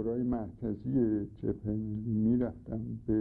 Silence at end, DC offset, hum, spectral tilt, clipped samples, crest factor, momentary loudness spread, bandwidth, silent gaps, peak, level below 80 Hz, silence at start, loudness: 0 s; under 0.1%; none; -13 dB/octave; under 0.1%; 14 dB; 8 LU; 2.3 kHz; none; -18 dBFS; -50 dBFS; 0 s; -33 LUFS